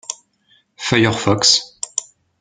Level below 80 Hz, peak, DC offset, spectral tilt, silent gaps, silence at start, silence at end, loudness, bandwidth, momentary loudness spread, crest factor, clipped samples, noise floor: -54 dBFS; 0 dBFS; under 0.1%; -3 dB/octave; none; 0.1 s; 0.4 s; -16 LUFS; 9.6 kHz; 16 LU; 20 dB; under 0.1%; -58 dBFS